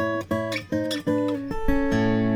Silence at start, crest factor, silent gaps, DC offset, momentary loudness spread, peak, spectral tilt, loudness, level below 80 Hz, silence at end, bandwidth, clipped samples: 0 s; 16 dB; none; under 0.1%; 5 LU; -8 dBFS; -6.5 dB/octave; -25 LUFS; -36 dBFS; 0 s; 17 kHz; under 0.1%